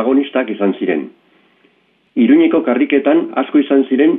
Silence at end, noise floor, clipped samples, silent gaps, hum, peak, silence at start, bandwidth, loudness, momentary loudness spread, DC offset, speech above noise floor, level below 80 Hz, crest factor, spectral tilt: 0 s; -57 dBFS; under 0.1%; none; none; 0 dBFS; 0 s; 3.8 kHz; -14 LUFS; 8 LU; under 0.1%; 44 dB; -64 dBFS; 14 dB; -10 dB/octave